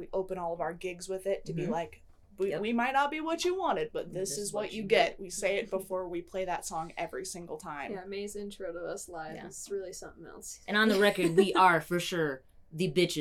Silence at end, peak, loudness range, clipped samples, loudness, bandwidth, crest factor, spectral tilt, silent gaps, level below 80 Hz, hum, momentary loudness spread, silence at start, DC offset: 0 s; -10 dBFS; 11 LU; under 0.1%; -31 LUFS; 16 kHz; 22 dB; -4 dB/octave; none; -58 dBFS; none; 16 LU; 0 s; under 0.1%